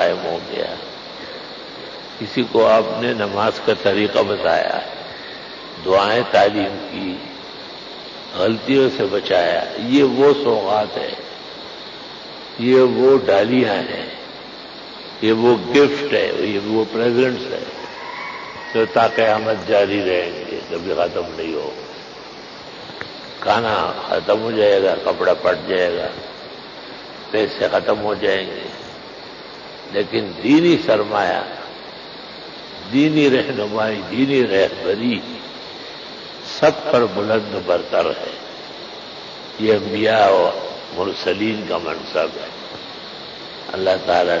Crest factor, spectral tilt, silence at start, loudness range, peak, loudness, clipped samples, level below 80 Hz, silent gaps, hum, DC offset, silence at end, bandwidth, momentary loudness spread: 16 dB; -5.5 dB/octave; 0 s; 4 LU; -4 dBFS; -18 LUFS; under 0.1%; -54 dBFS; none; none; under 0.1%; 0 s; 7.6 kHz; 18 LU